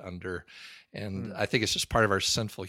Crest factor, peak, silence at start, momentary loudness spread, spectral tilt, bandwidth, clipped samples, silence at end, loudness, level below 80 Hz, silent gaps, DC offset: 22 dB; -8 dBFS; 0 s; 18 LU; -3.5 dB/octave; 16.5 kHz; under 0.1%; 0 s; -28 LUFS; -50 dBFS; none; under 0.1%